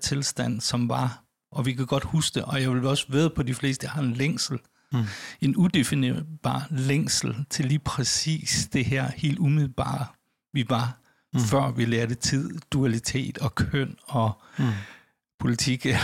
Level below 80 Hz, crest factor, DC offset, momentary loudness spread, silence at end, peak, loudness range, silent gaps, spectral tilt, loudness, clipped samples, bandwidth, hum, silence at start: -50 dBFS; 16 dB; under 0.1%; 7 LU; 0 s; -10 dBFS; 2 LU; 15.34-15.38 s; -5 dB/octave; -26 LUFS; under 0.1%; 16 kHz; none; 0 s